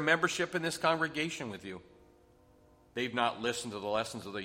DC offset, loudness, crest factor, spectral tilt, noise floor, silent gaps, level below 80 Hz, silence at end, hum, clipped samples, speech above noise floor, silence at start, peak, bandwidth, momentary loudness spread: under 0.1%; -33 LUFS; 22 dB; -3.5 dB/octave; -63 dBFS; none; -68 dBFS; 0 s; none; under 0.1%; 29 dB; 0 s; -12 dBFS; 16 kHz; 14 LU